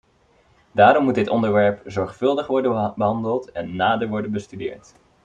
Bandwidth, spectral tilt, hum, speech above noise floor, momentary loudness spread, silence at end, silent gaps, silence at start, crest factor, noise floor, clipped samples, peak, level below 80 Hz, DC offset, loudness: 9 kHz; -7 dB/octave; none; 38 dB; 13 LU; 0.5 s; none; 0.75 s; 18 dB; -58 dBFS; under 0.1%; -2 dBFS; -58 dBFS; under 0.1%; -20 LUFS